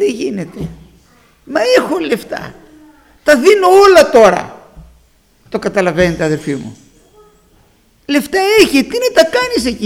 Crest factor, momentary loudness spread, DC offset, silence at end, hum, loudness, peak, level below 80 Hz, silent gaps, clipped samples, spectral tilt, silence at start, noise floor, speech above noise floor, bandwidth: 14 dB; 19 LU; under 0.1%; 0 s; none; -11 LUFS; 0 dBFS; -42 dBFS; none; 0.3%; -4.5 dB/octave; 0 s; -51 dBFS; 40 dB; 17 kHz